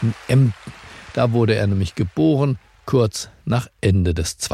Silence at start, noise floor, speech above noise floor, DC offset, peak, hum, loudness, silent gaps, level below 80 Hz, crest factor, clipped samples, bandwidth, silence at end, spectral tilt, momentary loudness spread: 0 s; -38 dBFS; 20 dB; under 0.1%; -4 dBFS; none; -20 LUFS; none; -40 dBFS; 16 dB; under 0.1%; 14 kHz; 0 s; -6.5 dB/octave; 11 LU